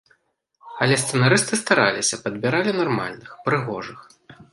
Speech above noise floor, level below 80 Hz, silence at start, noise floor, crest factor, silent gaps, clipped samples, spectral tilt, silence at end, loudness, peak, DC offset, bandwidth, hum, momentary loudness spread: 45 dB; -64 dBFS; 0.65 s; -67 dBFS; 22 dB; none; under 0.1%; -4 dB/octave; 0.1 s; -21 LUFS; -2 dBFS; under 0.1%; 11.5 kHz; none; 14 LU